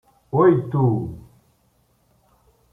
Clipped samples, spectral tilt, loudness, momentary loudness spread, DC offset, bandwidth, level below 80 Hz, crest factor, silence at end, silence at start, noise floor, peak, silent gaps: under 0.1%; -11 dB/octave; -19 LUFS; 17 LU; under 0.1%; 3.7 kHz; -54 dBFS; 18 dB; 1.5 s; 0.35 s; -63 dBFS; -4 dBFS; none